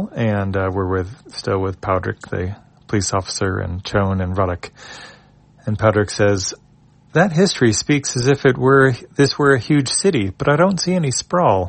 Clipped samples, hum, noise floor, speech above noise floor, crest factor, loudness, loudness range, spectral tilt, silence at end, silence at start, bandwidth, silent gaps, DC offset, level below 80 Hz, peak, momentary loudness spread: under 0.1%; none; -51 dBFS; 33 dB; 18 dB; -18 LUFS; 7 LU; -5 dB/octave; 0 s; 0 s; 8.8 kHz; none; under 0.1%; -48 dBFS; 0 dBFS; 11 LU